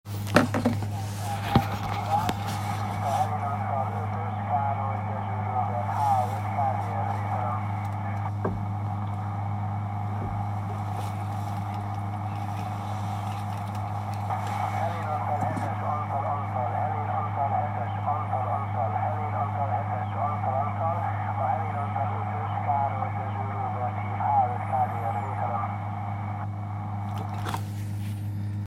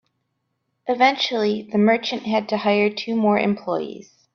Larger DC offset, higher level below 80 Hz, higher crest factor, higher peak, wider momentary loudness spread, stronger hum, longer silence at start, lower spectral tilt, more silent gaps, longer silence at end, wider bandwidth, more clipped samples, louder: neither; first, -54 dBFS vs -66 dBFS; first, 26 dB vs 20 dB; about the same, -2 dBFS vs -2 dBFS; about the same, 7 LU vs 9 LU; neither; second, 0.05 s vs 0.85 s; first, -7 dB/octave vs -5.5 dB/octave; neither; second, 0 s vs 0.35 s; first, 15.5 kHz vs 6.8 kHz; neither; second, -29 LUFS vs -20 LUFS